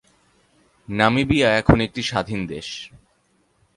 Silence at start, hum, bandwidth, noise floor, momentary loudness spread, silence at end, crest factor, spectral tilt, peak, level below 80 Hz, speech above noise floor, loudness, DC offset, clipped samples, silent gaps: 0.9 s; none; 11.5 kHz; -64 dBFS; 16 LU; 0.9 s; 22 dB; -5.5 dB/octave; 0 dBFS; -38 dBFS; 44 dB; -20 LUFS; under 0.1%; under 0.1%; none